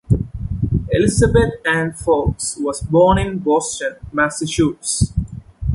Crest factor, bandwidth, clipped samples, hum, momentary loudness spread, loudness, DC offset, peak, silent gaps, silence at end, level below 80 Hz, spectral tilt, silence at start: 16 dB; 11.5 kHz; under 0.1%; none; 9 LU; -18 LUFS; under 0.1%; -2 dBFS; none; 0 s; -30 dBFS; -5.5 dB/octave; 0.1 s